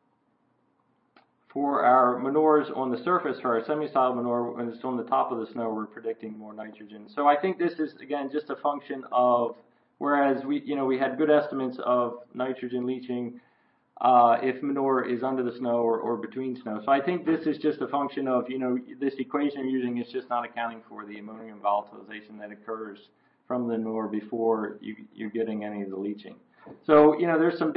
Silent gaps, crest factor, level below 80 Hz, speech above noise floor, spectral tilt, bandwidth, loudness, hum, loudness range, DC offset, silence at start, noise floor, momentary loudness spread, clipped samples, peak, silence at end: none; 20 dB; -76 dBFS; 43 dB; -10.5 dB/octave; 5.4 kHz; -27 LUFS; none; 7 LU; under 0.1%; 1.55 s; -70 dBFS; 16 LU; under 0.1%; -8 dBFS; 0 s